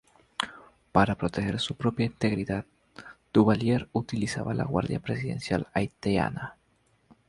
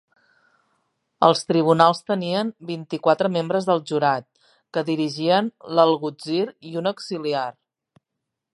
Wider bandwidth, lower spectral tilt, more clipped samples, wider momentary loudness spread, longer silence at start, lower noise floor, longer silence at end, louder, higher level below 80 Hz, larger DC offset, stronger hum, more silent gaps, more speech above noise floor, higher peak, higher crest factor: about the same, 11.5 kHz vs 11.5 kHz; about the same, -6.5 dB/octave vs -6 dB/octave; neither; first, 14 LU vs 11 LU; second, 0.4 s vs 1.2 s; second, -67 dBFS vs -82 dBFS; second, 0.75 s vs 1.05 s; second, -28 LUFS vs -22 LUFS; first, -52 dBFS vs -72 dBFS; neither; neither; neither; second, 41 dB vs 61 dB; second, -4 dBFS vs 0 dBFS; about the same, 24 dB vs 22 dB